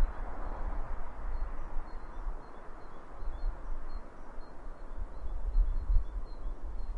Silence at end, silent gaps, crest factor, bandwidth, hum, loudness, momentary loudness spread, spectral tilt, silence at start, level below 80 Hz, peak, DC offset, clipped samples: 0 s; none; 20 dB; 4.5 kHz; none; -42 LUFS; 15 LU; -8 dB/octave; 0 s; -34 dBFS; -14 dBFS; under 0.1%; under 0.1%